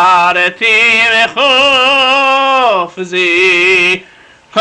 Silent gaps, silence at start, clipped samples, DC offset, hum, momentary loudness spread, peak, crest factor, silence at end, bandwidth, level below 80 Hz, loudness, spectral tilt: none; 0 s; under 0.1%; under 0.1%; none; 7 LU; -2 dBFS; 8 dB; 0 s; 11 kHz; -50 dBFS; -8 LUFS; -2 dB/octave